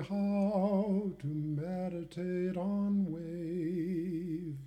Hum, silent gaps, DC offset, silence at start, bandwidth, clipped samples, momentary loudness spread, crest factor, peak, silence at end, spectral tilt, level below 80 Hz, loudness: none; none; under 0.1%; 0 s; 9 kHz; under 0.1%; 8 LU; 12 dB; -22 dBFS; 0 s; -9.5 dB/octave; -64 dBFS; -35 LUFS